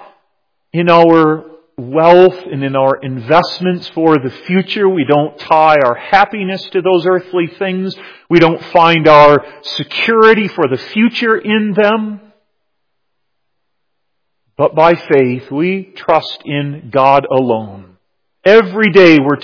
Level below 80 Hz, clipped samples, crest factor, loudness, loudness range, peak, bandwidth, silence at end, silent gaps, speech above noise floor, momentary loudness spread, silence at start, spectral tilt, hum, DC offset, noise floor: -52 dBFS; 2%; 12 dB; -11 LUFS; 6 LU; 0 dBFS; 5.4 kHz; 0 s; none; 62 dB; 12 LU; 0.75 s; -7 dB/octave; none; under 0.1%; -73 dBFS